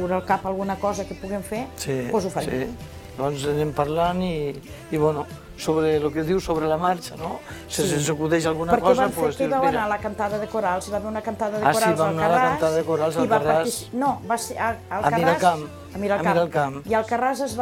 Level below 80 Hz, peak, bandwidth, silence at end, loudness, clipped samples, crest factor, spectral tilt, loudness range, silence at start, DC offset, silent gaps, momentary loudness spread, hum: -48 dBFS; -4 dBFS; 17 kHz; 0 s; -23 LUFS; under 0.1%; 18 dB; -5 dB/octave; 4 LU; 0 s; under 0.1%; none; 11 LU; none